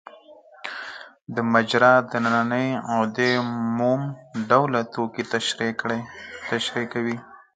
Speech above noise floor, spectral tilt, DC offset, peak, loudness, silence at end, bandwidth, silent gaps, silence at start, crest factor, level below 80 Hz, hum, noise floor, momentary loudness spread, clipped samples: 26 dB; -5 dB/octave; under 0.1%; -2 dBFS; -23 LUFS; 0.2 s; 9.4 kHz; 1.22-1.26 s; 0.05 s; 22 dB; -66 dBFS; none; -49 dBFS; 16 LU; under 0.1%